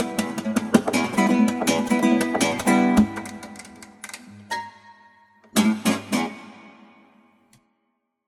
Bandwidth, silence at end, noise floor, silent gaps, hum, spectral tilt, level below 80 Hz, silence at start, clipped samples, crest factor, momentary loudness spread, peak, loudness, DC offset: 17 kHz; 1.55 s; -74 dBFS; none; none; -4.5 dB/octave; -52 dBFS; 0 s; under 0.1%; 22 dB; 20 LU; -2 dBFS; -22 LUFS; under 0.1%